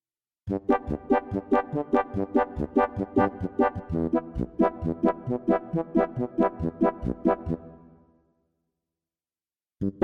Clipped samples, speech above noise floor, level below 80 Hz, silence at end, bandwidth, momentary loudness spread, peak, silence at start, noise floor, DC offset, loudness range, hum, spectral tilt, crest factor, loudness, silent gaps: under 0.1%; over 64 dB; -48 dBFS; 0 s; 6 kHz; 5 LU; -10 dBFS; 0.45 s; under -90 dBFS; under 0.1%; 4 LU; none; -10 dB/octave; 18 dB; -27 LUFS; none